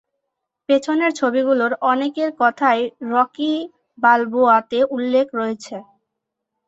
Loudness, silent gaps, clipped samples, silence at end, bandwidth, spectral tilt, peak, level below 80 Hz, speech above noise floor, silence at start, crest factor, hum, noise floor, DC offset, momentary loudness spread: -18 LUFS; none; under 0.1%; 0.85 s; 8 kHz; -4.5 dB/octave; -2 dBFS; -68 dBFS; 62 dB; 0.7 s; 18 dB; none; -80 dBFS; under 0.1%; 10 LU